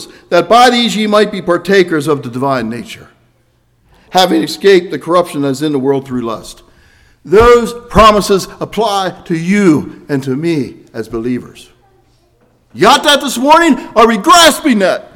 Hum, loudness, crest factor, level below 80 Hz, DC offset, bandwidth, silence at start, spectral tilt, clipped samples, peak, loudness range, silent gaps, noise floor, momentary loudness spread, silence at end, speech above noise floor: none; -10 LUFS; 12 dB; -34 dBFS; under 0.1%; over 20 kHz; 0 s; -4 dB/octave; 1%; 0 dBFS; 6 LU; none; -54 dBFS; 13 LU; 0.15 s; 44 dB